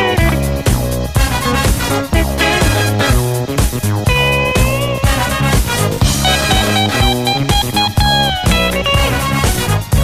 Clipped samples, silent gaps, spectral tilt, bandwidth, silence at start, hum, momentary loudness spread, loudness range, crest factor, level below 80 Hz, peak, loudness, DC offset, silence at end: under 0.1%; none; -4 dB/octave; 15.5 kHz; 0 s; none; 4 LU; 1 LU; 12 dB; -20 dBFS; 0 dBFS; -13 LUFS; under 0.1%; 0 s